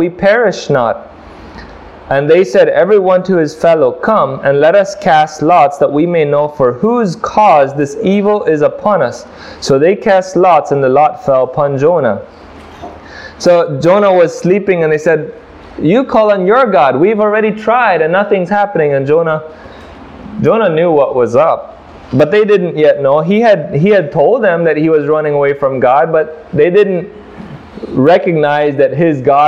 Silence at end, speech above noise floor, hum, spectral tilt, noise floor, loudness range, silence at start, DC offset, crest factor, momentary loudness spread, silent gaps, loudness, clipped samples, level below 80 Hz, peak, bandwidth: 0 s; 22 dB; none; -6.5 dB/octave; -32 dBFS; 3 LU; 0 s; 0.1%; 10 dB; 9 LU; none; -10 LUFS; under 0.1%; -46 dBFS; 0 dBFS; 9.8 kHz